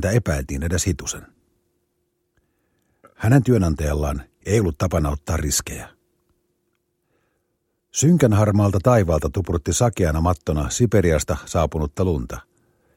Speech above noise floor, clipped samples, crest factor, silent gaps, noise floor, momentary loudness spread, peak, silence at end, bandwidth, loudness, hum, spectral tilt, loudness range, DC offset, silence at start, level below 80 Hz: 53 dB; under 0.1%; 20 dB; none; -72 dBFS; 11 LU; 0 dBFS; 0.55 s; 16.5 kHz; -20 LUFS; none; -6 dB/octave; 6 LU; under 0.1%; 0 s; -34 dBFS